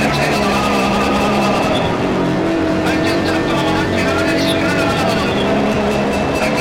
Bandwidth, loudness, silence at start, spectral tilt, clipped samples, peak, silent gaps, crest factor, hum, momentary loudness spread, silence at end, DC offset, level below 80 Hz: 16.5 kHz; -15 LUFS; 0 s; -5 dB/octave; under 0.1%; -4 dBFS; none; 12 dB; none; 2 LU; 0 s; 0.2%; -34 dBFS